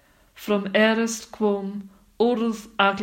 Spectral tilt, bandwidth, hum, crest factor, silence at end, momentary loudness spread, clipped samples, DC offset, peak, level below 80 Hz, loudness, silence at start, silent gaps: -4.5 dB/octave; 16 kHz; none; 20 dB; 0 s; 12 LU; under 0.1%; under 0.1%; -4 dBFS; -62 dBFS; -23 LUFS; 0.35 s; none